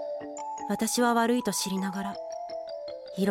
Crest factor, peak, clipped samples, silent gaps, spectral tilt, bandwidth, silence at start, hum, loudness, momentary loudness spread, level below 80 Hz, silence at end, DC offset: 18 dB; -12 dBFS; under 0.1%; none; -4 dB/octave; 16.5 kHz; 0 s; none; -30 LUFS; 13 LU; -68 dBFS; 0 s; under 0.1%